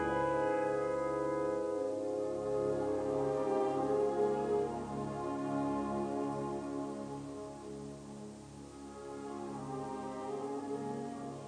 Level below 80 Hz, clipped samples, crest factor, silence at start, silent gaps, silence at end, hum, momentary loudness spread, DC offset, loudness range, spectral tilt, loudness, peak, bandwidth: -62 dBFS; under 0.1%; 16 dB; 0 s; none; 0 s; none; 14 LU; under 0.1%; 10 LU; -6.5 dB/octave; -37 LUFS; -22 dBFS; 10 kHz